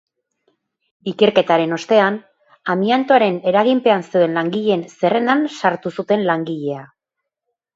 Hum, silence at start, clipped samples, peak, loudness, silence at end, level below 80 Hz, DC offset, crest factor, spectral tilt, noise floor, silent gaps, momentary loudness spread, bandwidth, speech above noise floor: none; 1.05 s; under 0.1%; 0 dBFS; -17 LUFS; 0.9 s; -66 dBFS; under 0.1%; 18 dB; -6 dB/octave; -81 dBFS; none; 11 LU; 7.8 kHz; 64 dB